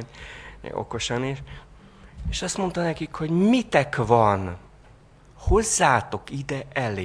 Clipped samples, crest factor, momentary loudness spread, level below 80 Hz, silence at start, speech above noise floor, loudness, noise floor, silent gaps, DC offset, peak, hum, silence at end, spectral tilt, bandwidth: under 0.1%; 22 dB; 20 LU; -38 dBFS; 0 s; 27 dB; -24 LUFS; -51 dBFS; none; under 0.1%; -2 dBFS; none; 0 s; -4.5 dB/octave; 11 kHz